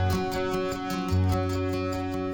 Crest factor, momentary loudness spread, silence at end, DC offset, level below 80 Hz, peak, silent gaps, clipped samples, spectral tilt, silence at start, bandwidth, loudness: 12 dB; 4 LU; 0 s; under 0.1%; -44 dBFS; -14 dBFS; none; under 0.1%; -6.5 dB/octave; 0 s; 19 kHz; -28 LUFS